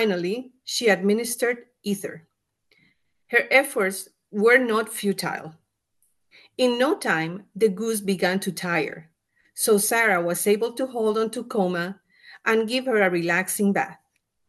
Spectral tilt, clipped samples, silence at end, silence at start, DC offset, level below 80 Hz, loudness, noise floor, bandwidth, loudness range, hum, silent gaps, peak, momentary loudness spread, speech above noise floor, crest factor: -4 dB/octave; under 0.1%; 0.55 s; 0 s; under 0.1%; -74 dBFS; -23 LUFS; -71 dBFS; 12.5 kHz; 3 LU; none; none; -2 dBFS; 13 LU; 48 dB; 22 dB